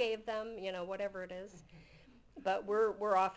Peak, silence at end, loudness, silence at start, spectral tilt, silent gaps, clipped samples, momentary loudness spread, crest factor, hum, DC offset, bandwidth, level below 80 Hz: -20 dBFS; 0 s; -37 LUFS; 0 s; -4.5 dB/octave; none; under 0.1%; 18 LU; 18 dB; none; under 0.1%; 8 kHz; -68 dBFS